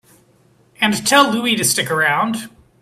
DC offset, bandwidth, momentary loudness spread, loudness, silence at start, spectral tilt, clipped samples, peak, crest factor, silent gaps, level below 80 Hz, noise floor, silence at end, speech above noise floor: under 0.1%; 16 kHz; 7 LU; -15 LUFS; 0.8 s; -2.5 dB/octave; under 0.1%; 0 dBFS; 18 dB; none; -58 dBFS; -54 dBFS; 0.35 s; 38 dB